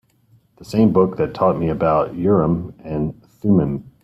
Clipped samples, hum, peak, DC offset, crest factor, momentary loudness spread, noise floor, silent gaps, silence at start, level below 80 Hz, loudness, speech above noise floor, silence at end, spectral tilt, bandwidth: under 0.1%; none; -4 dBFS; under 0.1%; 16 dB; 9 LU; -56 dBFS; none; 0.6 s; -44 dBFS; -19 LUFS; 39 dB; 0.15 s; -9.5 dB/octave; 12.5 kHz